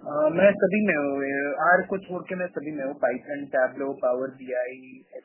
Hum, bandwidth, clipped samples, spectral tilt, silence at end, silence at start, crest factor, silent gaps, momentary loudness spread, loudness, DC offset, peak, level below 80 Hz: none; 3.2 kHz; under 0.1%; -10.5 dB/octave; 0.05 s; 0 s; 18 dB; none; 12 LU; -25 LUFS; under 0.1%; -6 dBFS; -70 dBFS